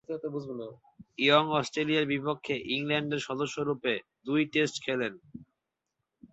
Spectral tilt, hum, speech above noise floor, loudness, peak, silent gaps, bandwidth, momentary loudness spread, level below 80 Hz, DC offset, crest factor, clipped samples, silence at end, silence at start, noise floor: -4.5 dB/octave; none; 55 dB; -29 LUFS; -8 dBFS; none; 8.2 kHz; 13 LU; -70 dBFS; under 0.1%; 24 dB; under 0.1%; 0.05 s; 0.1 s; -85 dBFS